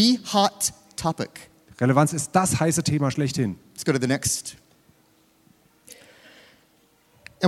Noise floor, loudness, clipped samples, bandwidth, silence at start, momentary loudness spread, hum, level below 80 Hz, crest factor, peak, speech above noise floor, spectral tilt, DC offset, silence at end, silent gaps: -61 dBFS; -23 LUFS; under 0.1%; 16 kHz; 0 s; 9 LU; none; -56 dBFS; 22 dB; -4 dBFS; 38 dB; -4.5 dB/octave; under 0.1%; 0 s; none